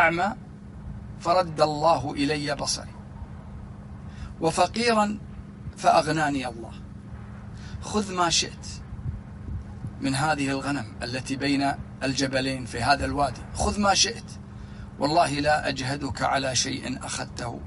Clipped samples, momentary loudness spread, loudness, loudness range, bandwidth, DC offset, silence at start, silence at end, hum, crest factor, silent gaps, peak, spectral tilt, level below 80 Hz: under 0.1%; 19 LU; -25 LUFS; 4 LU; 11.5 kHz; under 0.1%; 0 s; 0 s; none; 20 dB; none; -6 dBFS; -4 dB/octave; -44 dBFS